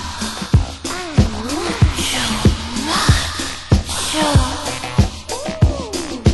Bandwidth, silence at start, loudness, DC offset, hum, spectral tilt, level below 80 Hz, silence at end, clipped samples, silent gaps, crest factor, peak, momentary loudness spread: 12.5 kHz; 0 s; -18 LUFS; under 0.1%; none; -4.5 dB/octave; -24 dBFS; 0 s; under 0.1%; none; 18 dB; 0 dBFS; 9 LU